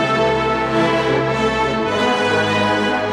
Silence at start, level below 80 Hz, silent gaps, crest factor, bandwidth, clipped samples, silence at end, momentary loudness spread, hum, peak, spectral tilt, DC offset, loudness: 0 s; -40 dBFS; none; 12 dB; 12.5 kHz; under 0.1%; 0 s; 2 LU; none; -4 dBFS; -5 dB/octave; under 0.1%; -17 LUFS